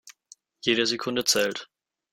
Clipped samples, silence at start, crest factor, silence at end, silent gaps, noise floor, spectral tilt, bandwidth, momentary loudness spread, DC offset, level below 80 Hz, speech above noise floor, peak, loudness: under 0.1%; 0.05 s; 20 dB; 0.5 s; none; -56 dBFS; -2 dB/octave; 16.5 kHz; 7 LU; under 0.1%; -68 dBFS; 31 dB; -8 dBFS; -24 LUFS